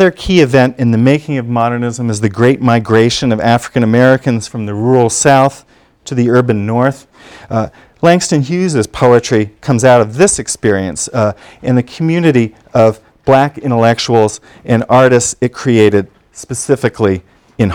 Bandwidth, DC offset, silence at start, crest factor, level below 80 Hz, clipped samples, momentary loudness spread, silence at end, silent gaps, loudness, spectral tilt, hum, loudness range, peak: 16 kHz; under 0.1%; 0 s; 12 dB; -40 dBFS; 0.9%; 8 LU; 0 s; none; -12 LUFS; -5.5 dB/octave; none; 2 LU; 0 dBFS